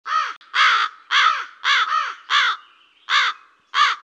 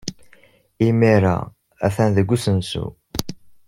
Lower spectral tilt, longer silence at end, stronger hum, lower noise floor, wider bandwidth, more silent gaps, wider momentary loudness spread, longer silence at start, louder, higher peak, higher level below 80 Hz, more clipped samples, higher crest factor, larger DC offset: second, 5.5 dB/octave vs -6.5 dB/octave; second, 0.05 s vs 0.35 s; neither; about the same, -51 dBFS vs -53 dBFS; second, 9.6 kHz vs 16 kHz; first, 0.37-0.41 s vs none; second, 7 LU vs 15 LU; about the same, 0.05 s vs 0.05 s; about the same, -18 LUFS vs -20 LUFS; about the same, -4 dBFS vs -2 dBFS; second, -90 dBFS vs -46 dBFS; neither; about the same, 16 dB vs 18 dB; neither